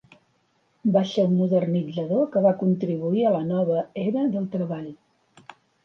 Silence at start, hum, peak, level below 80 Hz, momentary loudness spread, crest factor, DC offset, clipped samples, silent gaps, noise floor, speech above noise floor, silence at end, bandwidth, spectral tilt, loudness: 0.85 s; none; -8 dBFS; -70 dBFS; 8 LU; 16 dB; under 0.1%; under 0.1%; none; -67 dBFS; 44 dB; 0.9 s; 6.6 kHz; -9 dB/octave; -23 LUFS